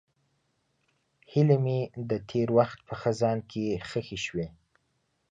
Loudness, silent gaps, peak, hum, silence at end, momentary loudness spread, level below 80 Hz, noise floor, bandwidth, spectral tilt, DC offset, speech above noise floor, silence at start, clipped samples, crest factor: -29 LUFS; none; -10 dBFS; none; 0.8 s; 10 LU; -60 dBFS; -75 dBFS; 8 kHz; -7 dB/octave; under 0.1%; 47 dB; 1.3 s; under 0.1%; 20 dB